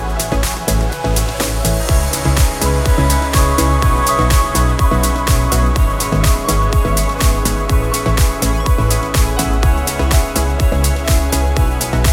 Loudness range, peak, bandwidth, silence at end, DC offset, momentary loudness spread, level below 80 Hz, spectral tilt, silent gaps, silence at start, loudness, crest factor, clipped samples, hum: 2 LU; 0 dBFS; 17 kHz; 0 s; under 0.1%; 3 LU; -16 dBFS; -4.5 dB/octave; none; 0 s; -15 LUFS; 12 dB; under 0.1%; none